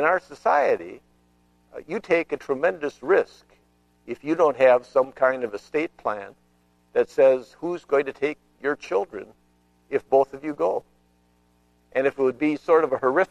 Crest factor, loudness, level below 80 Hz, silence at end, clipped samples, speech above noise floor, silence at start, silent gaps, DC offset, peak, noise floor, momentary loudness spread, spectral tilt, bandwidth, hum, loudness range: 18 dB; -23 LUFS; -64 dBFS; 0.05 s; under 0.1%; 40 dB; 0 s; none; under 0.1%; -6 dBFS; -63 dBFS; 14 LU; -6 dB/octave; 9.6 kHz; 60 Hz at -65 dBFS; 4 LU